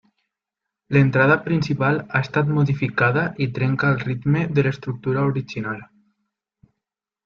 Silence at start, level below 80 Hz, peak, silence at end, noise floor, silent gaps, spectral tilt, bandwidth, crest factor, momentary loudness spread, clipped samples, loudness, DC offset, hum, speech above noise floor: 0.9 s; -54 dBFS; -4 dBFS; 1.4 s; -85 dBFS; none; -8.5 dB/octave; 6.8 kHz; 18 dB; 9 LU; under 0.1%; -21 LUFS; under 0.1%; none; 65 dB